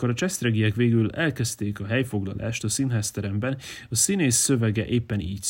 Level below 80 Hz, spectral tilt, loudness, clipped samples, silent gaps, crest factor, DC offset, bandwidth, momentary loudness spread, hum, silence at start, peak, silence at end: -52 dBFS; -4.5 dB/octave; -24 LUFS; under 0.1%; none; 16 dB; under 0.1%; 16.5 kHz; 9 LU; none; 0 s; -8 dBFS; 0 s